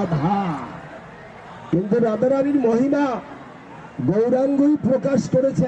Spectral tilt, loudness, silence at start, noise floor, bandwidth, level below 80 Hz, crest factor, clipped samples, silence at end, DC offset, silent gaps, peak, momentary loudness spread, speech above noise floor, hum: -8 dB/octave; -20 LUFS; 0 s; -40 dBFS; 8.4 kHz; -54 dBFS; 12 dB; under 0.1%; 0 s; under 0.1%; none; -8 dBFS; 21 LU; 21 dB; none